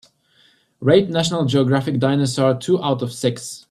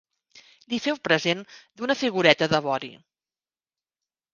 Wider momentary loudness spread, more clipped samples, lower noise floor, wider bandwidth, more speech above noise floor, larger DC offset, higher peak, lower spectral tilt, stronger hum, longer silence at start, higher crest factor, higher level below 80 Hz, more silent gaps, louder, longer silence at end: second, 7 LU vs 12 LU; neither; second, -57 dBFS vs under -90 dBFS; first, 13 kHz vs 9.6 kHz; second, 39 dB vs over 66 dB; neither; about the same, -2 dBFS vs 0 dBFS; first, -6 dB/octave vs -4.5 dB/octave; neither; first, 0.8 s vs 0.35 s; second, 18 dB vs 26 dB; first, -56 dBFS vs -64 dBFS; neither; first, -19 LUFS vs -24 LUFS; second, 0.1 s vs 1.4 s